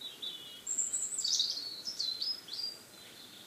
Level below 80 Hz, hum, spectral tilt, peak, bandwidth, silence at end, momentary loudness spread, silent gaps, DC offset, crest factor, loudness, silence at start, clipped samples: -84 dBFS; none; 2 dB/octave; -18 dBFS; 16 kHz; 0 s; 19 LU; none; under 0.1%; 20 dB; -34 LUFS; 0 s; under 0.1%